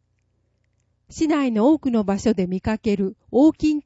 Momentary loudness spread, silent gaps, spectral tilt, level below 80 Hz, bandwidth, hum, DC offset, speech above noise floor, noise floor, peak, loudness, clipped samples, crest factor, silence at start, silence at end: 7 LU; none; -7 dB/octave; -48 dBFS; 8 kHz; 60 Hz at -45 dBFS; under 0.1%; 48 dB; -68 dBFS; -6 dBFS; -20 LUFS; under 0.1%; 14 dB; 1.1 s; 0.05 s